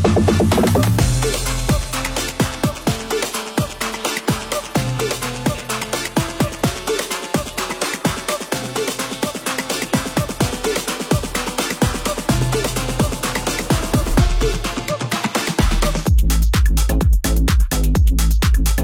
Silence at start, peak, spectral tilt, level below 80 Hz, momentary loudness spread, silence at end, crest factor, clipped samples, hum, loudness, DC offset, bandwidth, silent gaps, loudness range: 0 s; -2 dBFS; -4.5 dB/octave; -22 dBFS; 6 LU; 0 s; 16 dB; under 0.1%; none; -19 LUFS; under 0.1%; 18 kHz; none; 4 LU